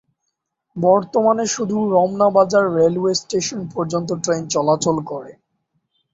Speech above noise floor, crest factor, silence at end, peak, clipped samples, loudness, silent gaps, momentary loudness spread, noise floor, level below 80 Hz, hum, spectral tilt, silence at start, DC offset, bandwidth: 58 dB; 18 dB; 0.8 s; -2 dBFS; under 0.1%; -18 LUFS; none; 9 LU; -76 dBFS; -60 dBFS; none; -5 dB/octave; 0.75 s; under 0.1%; 8 kHz